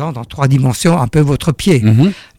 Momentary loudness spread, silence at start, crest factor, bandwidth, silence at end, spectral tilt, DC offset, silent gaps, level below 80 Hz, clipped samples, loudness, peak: 4 LU; 0 s; 10 dB; 15.5 kHz; 0.15 s; -6.5 dB/octave; under 0.1%; none; -36 dBFS; under 0.1%; -12 LUFS; -2 dBFS